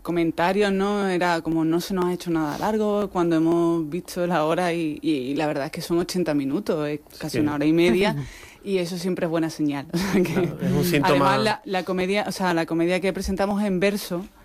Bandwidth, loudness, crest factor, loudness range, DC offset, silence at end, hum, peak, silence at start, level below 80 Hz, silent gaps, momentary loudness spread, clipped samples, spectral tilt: 15.5 kHz; -23 LUFS; 14 dB; 2 LU; under 0.1%; 0.15 s; none; -10 dBFS; 0.05 s; -48 dBFS; none; 7 LU; under 0.1%; -6 dB/octave